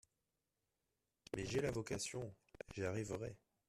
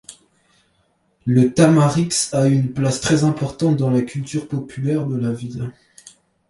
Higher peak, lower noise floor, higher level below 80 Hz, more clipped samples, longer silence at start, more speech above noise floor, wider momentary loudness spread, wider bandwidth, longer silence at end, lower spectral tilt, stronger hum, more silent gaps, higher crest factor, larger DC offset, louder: second, -28 dBFS vs -2 dBFS; first, -89 dBFS vs -64 dBFS; second, -66 dBFS vs -52 dBFS; neither; first, 1.35 s vs 0.1 s; about the same, 46 dB vs 46 dB; about the same, 12 LU vs 14 LU; first, 13.5 kHz vs 11.5 kHz; second, 0.35 s vs 0.8 s; about the same, -5 dB/octave vs -6 dB/octave; neither; neither; about the same, 20 dB vs 16 dB; neither; second, -45 LUFS vs -18 LUFS